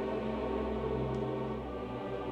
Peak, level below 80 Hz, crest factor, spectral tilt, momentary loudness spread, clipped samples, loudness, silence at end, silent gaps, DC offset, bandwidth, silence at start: -22 dBFS; -48 dBFS; 12 dB; -8.5 dB/octave; 5 LU; under 0.1%; -36 LUFS; 0 s; none; under 0.1%; 9 kHz; 0 s